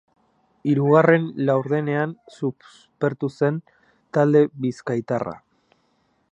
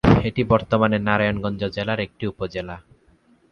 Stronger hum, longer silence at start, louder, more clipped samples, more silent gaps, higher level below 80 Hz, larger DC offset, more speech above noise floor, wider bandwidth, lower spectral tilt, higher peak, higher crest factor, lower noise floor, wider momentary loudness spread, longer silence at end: neither; first, 0.65 s vs 0.05 s; about the same, -22 LUFS vs -22 LUFS; neither; neither; second, -68 dBFS vs -38 dBFS; neither; first, 45 dB vs 35 dB; first, 8.4 kHz vs 6.8 kHz; about the same, -8.5 dB/octave vs -8 dB/octave; about the same, -2 dBFS vs 0 dBFS; about the same, 22 dB vs 20 dB; first, -66 dBFS vs -57 dBFS; about the same, 13 LU vs 12 LU; first, 0.95 s vs 0.7 s